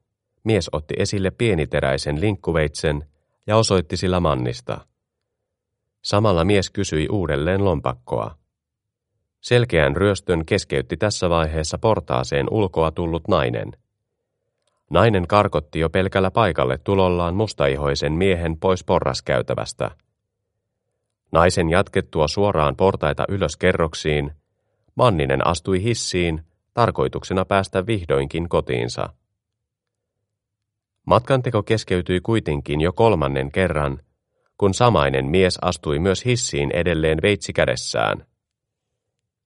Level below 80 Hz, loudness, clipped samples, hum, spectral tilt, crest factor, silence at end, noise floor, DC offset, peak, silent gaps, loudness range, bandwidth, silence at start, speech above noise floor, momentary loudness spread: -38 dBFS; -20 LUFS; under 0.1%; none; -5.5 dB/octave; 20 dB; 1.25 s; -82 dBFS; under 0.1%; 0 dBFS; none; 4 LU; 11.5 kHz; 0.45 s; 63 dB; 8 LU